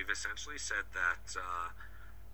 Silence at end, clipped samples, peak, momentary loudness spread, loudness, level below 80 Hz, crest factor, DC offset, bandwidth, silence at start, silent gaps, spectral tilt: 0 s; under 0.1%; -20 dBFS; 18 LU; -38 LUFS; -54 dBFS; 20 dB; 0.4%; over 20 kHz; 0 s; none; -1 dB/octave